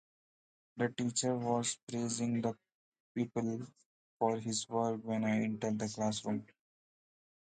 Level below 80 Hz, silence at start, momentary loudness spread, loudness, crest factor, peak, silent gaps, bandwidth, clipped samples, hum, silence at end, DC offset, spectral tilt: -76 dBFS; 0.75 s; 7 LU; -36 LUFS; 20 dB; -18 dBFS; 1.83-1.87 s, 2.74-2.92 s, 3.00-3.15 s, 3.86-4.20 s; 9.4 kHz; under 0.1%; none; 1.05 s; under 0.1%; -4.5 dB/octave